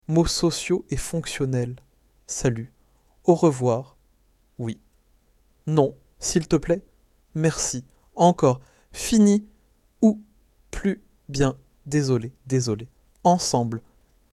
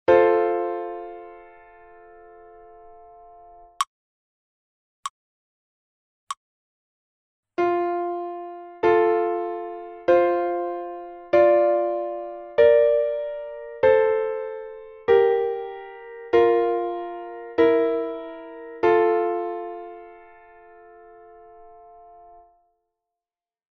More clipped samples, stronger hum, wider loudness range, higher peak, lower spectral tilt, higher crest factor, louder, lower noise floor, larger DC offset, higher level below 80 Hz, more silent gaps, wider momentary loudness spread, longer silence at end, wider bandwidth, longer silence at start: neither; neither; second, 4 LU vs 17 LU; about the same, -4 dBFS vs -4 dBFS; about the same, -5.5 dB/octave vs -5.5 dB/octave; about the same, 20 dB vs 20 dB; about the same, -24 LUFS vs -22 LUFS; second, -62 dBFS vs under -90 dBFS; neither; first, -44 dBFS vs -62 dBFS; second, none vs 3.87-5.03 s, 5.10-6.27 s, 6.37-7.43 s; second, 15 LU vs 19 LU; second, 0.55 s vs 2.1 s; first, 14 kHz vs 8.4 kHz; about the same, 0.1 s vs 0.1 s